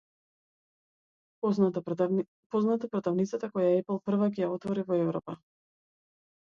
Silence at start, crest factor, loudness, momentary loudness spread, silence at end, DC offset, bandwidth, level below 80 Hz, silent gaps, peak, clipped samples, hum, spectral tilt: 1.45 s; 16 dB; -30 LUFS; 6 LU; 1.15 s; under 0.1%; 7.2 kHz; -74 dBFS; 2.28-2.50 s; -14 dBFS; under 0.1%; none; -8.5 dB/octave